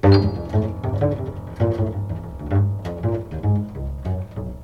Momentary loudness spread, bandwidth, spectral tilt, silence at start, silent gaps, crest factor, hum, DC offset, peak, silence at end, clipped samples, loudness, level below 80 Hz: 8 LU; 5.4 kHz; -9.5 dB/octave; 0.05 s; none; 18 dB; none; under 0.1%; -2 dBFS; 0 s; under 0.1%; -23 LUFS; -36 dBFS